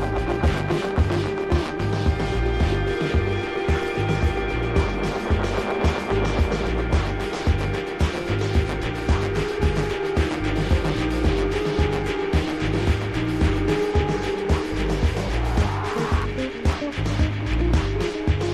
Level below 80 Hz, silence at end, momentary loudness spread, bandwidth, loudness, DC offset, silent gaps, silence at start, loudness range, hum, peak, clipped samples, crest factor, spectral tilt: -26 dBFS; 0 s; 3 LU; 12.5 kHz; -23 LUFS; under 0.1%; none; 0 s; 1 LU; none; -8 dBFS; under 0.1%; 14 dB; -6.5 dB/octave